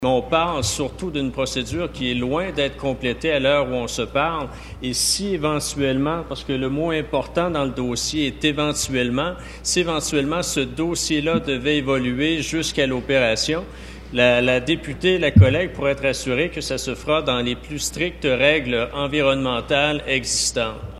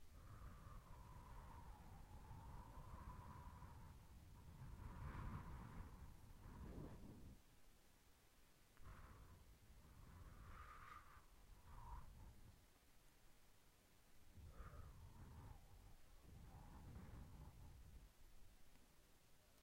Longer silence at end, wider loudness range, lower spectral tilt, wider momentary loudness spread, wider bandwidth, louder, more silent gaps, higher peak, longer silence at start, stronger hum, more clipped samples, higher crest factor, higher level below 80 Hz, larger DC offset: about the same, 0 s vs 0 s; second, 4 LU vs 8 LU; second, -4 dB/octave vs -6 dB/octave; about the same, 8 LU vs 9 LU; second, 13 kHz vs 16 kHz; first, -21 LUFS vs -62 LUFS; neither; first, 0 dBFS vs -40 dBFS; about the same, 0 s vs 0 s; neither; neither; about the same, 20 dB vs 20 dB; first, -38 dBFS vs -64 dBFS; neither